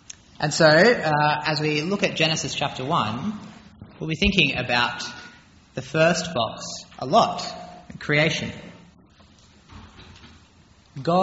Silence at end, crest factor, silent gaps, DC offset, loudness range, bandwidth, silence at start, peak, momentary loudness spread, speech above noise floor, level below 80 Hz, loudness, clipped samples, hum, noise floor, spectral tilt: 0 s; 20 dB; none; under 0.1%; 8 LU; 8 kHz; 0.1 s; -4 dBFS; 18 LU; 32 dB; -46 dBFS; -21 LUFS; under 0.1%; none; -54 dBFS; -3 dB/octave